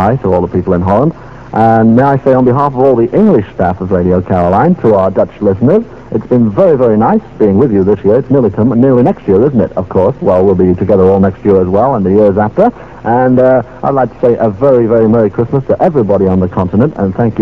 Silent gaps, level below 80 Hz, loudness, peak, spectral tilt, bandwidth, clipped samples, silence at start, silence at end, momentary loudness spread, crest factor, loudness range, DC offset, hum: none; -38 dBFS; -10 LUFS; 0 dBFS; -11 dB/octave; 6.2 kHz; 1%; 0 s; 0 s; 5 LU; 8 dB; 1 LU; 0.9%; none